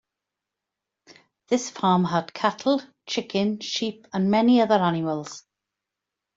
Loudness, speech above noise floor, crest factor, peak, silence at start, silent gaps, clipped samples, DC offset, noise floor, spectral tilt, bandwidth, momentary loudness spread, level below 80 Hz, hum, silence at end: -24 LUFS; 63 dB; 18 dB; -6 dBFS; 1.5 s; none; under 0.1%; under 0.1%; -86 dBFS; -5.5 dB/octave; 7.8 kHz; 11 LU; -68 dBFS; none; 0.95 s